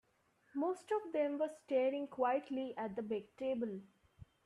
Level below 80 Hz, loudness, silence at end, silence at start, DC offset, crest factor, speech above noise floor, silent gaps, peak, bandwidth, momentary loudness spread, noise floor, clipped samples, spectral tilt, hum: -76 dBFS; -39 LUFS; 0.6 s; 0.55 s; under 0.1%; 16 dB; 36 dB; none; -24 dBFS; 11 kHz; 7 LU; -75 dBFS; under 0.1%; -6.5 dB/octave; none